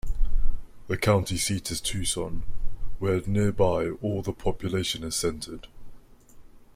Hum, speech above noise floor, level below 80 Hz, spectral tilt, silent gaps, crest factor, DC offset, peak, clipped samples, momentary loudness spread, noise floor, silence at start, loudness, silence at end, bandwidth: none; 22 dB; -32 dBFS; -4.5 dB/octave; none; 16 dB; under 0.1%; -10 dBFS; under 0.1%; 15 LU; -48 dBFS; 0.05 s; -28 LUFS; 0.3 s; 15.5 kHz